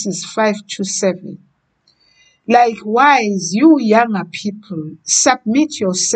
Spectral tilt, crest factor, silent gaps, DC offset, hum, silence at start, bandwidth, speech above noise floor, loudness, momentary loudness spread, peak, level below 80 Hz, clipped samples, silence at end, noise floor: -3.5 dB/octave; 16 dB; none; under 0.1%; none; 0 s; 9.4 kHz; 45 dB; -14 LUFS; 15 LU; 0 dBFS; -64 dBFS; under 0.1%; 0 s; -60 dBFS